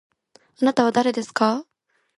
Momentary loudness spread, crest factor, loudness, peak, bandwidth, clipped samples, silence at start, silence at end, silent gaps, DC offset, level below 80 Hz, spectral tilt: 4 LU; 20 dB; -21 LUFS; -2 dBFS; 11.5 kHz; under 0.1%; 0.6 s; 0.55 s; none; under 0.1%; -68 dBFS; -4.5 dB/octave